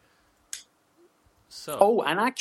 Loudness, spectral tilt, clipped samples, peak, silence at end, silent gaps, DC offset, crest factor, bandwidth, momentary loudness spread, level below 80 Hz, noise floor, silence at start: -24 LUFS; -3.5 dB/octave; under 0.1%; -4 dBFS; 0 s; none; under 0.1%; 24 dB; 15.5 kHz; 19 LU; -72 dBFS; -64 dBFS; 0.55 s